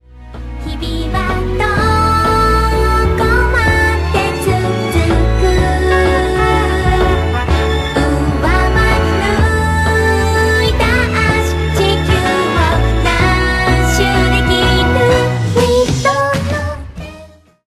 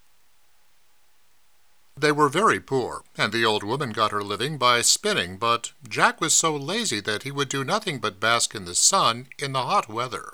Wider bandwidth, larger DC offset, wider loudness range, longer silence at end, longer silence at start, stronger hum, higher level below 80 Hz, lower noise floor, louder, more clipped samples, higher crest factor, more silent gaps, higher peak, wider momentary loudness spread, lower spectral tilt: second, 15 kHz vs over 20 kHz; second, under 0.1% vs 0.2%; about the same, 1 LU vs 3 LU; first, 0.4 s vs 0 s; second, 0.15 s vs 1.95 s; neither; first, -18 dBFS vs -66 dBFS; second, -39 dBFS vs -65 dBFS; first, -13 LUFS vs -22 LUFS; neither; second, 12 dB vs 22 dB; neither; about the same, 0 dBFS vs -2 dBFS; second, 5 LU vs 10 LU; first, -5.5 dB/octave vs -2 dB/octave